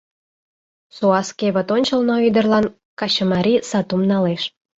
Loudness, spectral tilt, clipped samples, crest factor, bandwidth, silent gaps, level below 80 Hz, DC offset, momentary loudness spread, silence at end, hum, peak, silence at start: -18 LUFS; -5.5 dB/octave; under 0.1%; 16 dB; 8 kHz; 2.85-2.97 s; -56 dBFS; under 0.1%; 5 LU; 0.3 s; none; -4 dBFS; 0.95 s